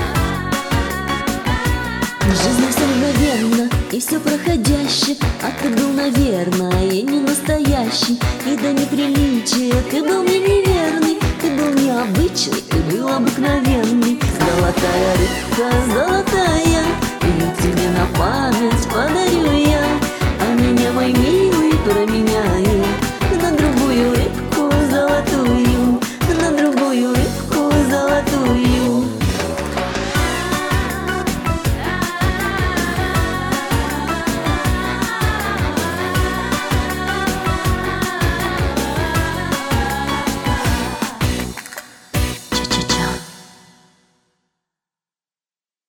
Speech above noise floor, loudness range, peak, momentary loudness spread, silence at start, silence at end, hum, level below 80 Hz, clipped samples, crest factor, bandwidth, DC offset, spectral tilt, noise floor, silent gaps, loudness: over 74 dB; 4 LU; -2 dBFS; 5 LU; 0 s; 2.45 s; none; -28 dBFS; under 0.1%; 14 dB; 19 kHz; under 0.1%; -5 dB/octave; under -90 dBFS; none; -17 LUFS